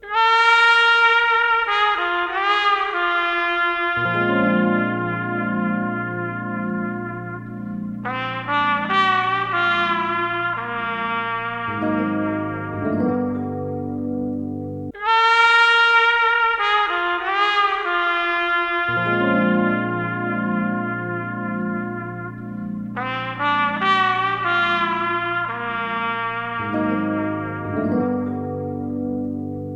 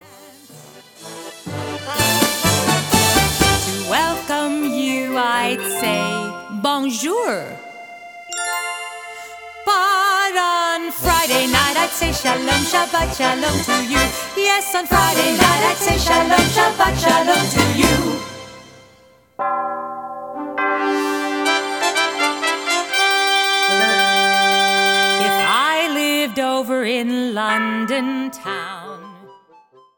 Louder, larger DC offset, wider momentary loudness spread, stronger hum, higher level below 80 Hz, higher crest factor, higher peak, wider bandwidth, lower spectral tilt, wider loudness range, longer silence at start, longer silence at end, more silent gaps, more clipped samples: second, -20 LUFS vs -17 LUFS; neither; about the same, 13 LU vs 15 LU; neither; second, -54 dBFS vs -38 dBFS; about the same, 18 dB vs 18 dB; about the same, -2 dBFS vs 0 dBFS; second, 9.8 kHz vs 19.5 kHz; first, -5.5 dB/octave vs -3 dB/octave; about the same, 8 LU vs 7 LU; about the same, 0.05 s vs 0.1 s; second, 0 s vs 0.65 s; neither; neither